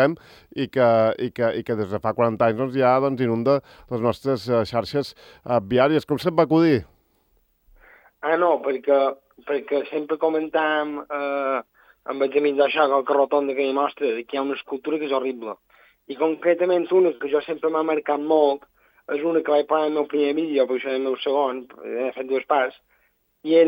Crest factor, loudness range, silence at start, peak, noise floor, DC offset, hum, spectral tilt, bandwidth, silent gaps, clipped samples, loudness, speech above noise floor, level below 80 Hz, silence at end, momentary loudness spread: 18 dB; 3 LU; 0 s; -4 dBFS; -66 dBFS; under 0.1%; none; -7.5 dB/octave; 16.5 kHz; none; under 0.1%; -22 LUFS; 44 dB; -62 dBFS; 0 s; 10 LU